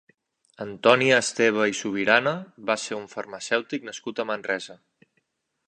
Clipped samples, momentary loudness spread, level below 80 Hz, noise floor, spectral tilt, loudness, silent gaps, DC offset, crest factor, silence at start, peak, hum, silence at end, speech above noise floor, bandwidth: under 0.1%; 15 LU; -70 dBFS; -74 dBFS; -3.5 dB/octave; -24 LUFS; none; under 0.1%; 24 dB; 0.6 s; -2 dBFS; none; 0.95 s; 49 dB; 11 kHz